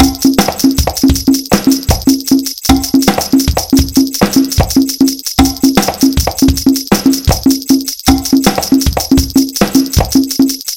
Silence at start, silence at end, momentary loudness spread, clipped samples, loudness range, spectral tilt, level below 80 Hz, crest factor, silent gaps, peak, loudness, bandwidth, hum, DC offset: 0 s; 0 s; 2 LU; 0.7%; 0 LU; -4.5 dB/octave; -22 dBFS; 10 dB; none; 0 dBFS; -11 LUFS; 17.5 kHz; none; 0.4%